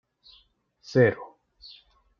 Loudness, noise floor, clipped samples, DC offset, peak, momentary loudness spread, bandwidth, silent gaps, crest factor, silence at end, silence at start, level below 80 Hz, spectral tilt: -23 LUFS; -63 dBFS; under 0.1%; under 0.1%; -6 dBFS; 26 LU; 7.2 kHz; none; 22 dB; 0.95 s; 0.9 s; -66 dBFS; -6 dB/octave